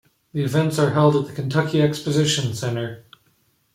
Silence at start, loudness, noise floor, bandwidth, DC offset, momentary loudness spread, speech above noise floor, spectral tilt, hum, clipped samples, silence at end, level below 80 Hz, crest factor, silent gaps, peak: 0.35 s; -21 LUFS; -63 dBFS; 15.5 kHz; under 0.1%; 10 LU; 44 dB; -5.5 dB/octave; none; under 0.1%; 0.75 s; -58 dBFS; 16 dB; none; -4 dBFS